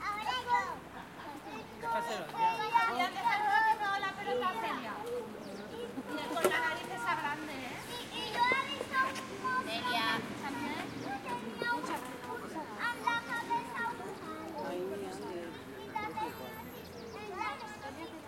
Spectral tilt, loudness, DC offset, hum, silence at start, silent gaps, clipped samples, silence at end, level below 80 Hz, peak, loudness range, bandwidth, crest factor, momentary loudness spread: -3.5 dB/octave; -35 LUFS; under 0.1%; none; 0 s; none; under 0.1%; 0 s; -70 dBFS; -14 dBFS; 8 LU; 16.5 kHz; 22 dB; 14 LU